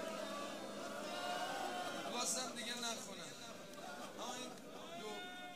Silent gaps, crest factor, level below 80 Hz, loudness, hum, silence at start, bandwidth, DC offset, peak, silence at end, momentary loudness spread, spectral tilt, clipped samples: none; 20 dB; -82 dBFS; -45 LUFS; none; 0 s; 15.5 kHz; under 0.1%; -26 dBFS; 0 s; 11 LU; -1.5 dB/octave; under 0.1%